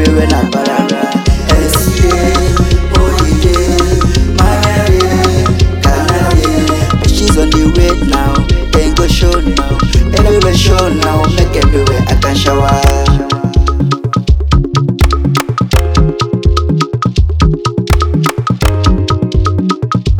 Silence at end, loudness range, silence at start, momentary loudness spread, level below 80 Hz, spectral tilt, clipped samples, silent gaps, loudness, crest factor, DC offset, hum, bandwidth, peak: 0 s; 2 LU; 0 s; 3 LU; -14 dBFS; -5.5 dB/octave; 0.5%; none; -11 LUFS; 10 dB; under 0.1%; none; 18 kHz; 0 dBFS